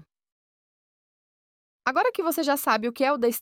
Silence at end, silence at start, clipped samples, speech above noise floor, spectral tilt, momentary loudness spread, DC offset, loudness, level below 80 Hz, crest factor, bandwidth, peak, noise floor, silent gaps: 0 s; 1.85 s; under 0.1%; over 66 dB; -2.5 dB/octave; 3 LU; under 0.1%; -25 LUFS; -74 dBFS; 18 dB; 18 kHz; -8 dBFS; under -90 dBFS; none